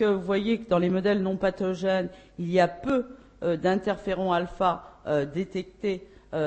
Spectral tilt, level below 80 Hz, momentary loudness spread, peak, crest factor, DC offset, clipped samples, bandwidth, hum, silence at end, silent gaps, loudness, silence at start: -7 dB/octave; -54 dBFS; 10 LU; -10 dBFS; 18 dB; under 0.1%; under 0.1%; 8.6 kHz; none; 0 s; none; -27 LUFS; 0 s